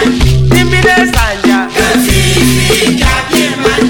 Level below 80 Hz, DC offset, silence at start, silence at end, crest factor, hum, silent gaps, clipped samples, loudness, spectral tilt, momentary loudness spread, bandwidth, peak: -18 dBFS; under 0.1%; 0 s; 0 s; 8 dB; none; none; 0.3%; -8 LUFS; -4.5 dB/octave; 3 LU; 19 kHz; 0 dBFS